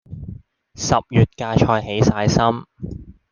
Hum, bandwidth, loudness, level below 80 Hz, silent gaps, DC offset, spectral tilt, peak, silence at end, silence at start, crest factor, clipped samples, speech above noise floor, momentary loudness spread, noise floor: none; 9.4 kHz; -18 LUFS; -40 dBFS; none; under 0.1%; -6 dB/octave; -2 dBFS; 0.2 s; 0.1 s; 18 dB; under 0.1%; 22 dB; 18 LU; -40 dBFS